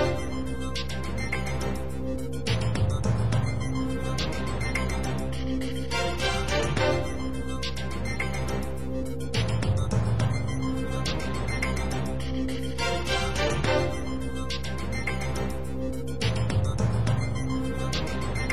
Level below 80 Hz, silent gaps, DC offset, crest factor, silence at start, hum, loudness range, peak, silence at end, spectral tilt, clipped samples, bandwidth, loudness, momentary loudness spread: -36 dBFS; none; 2%; 16 dB; 0 s; none; 1 LU; -12 dBFS; 0 s; -5.5 dB/octave; under 0.1%; 15 kHz; -29 LUFS; 7 LU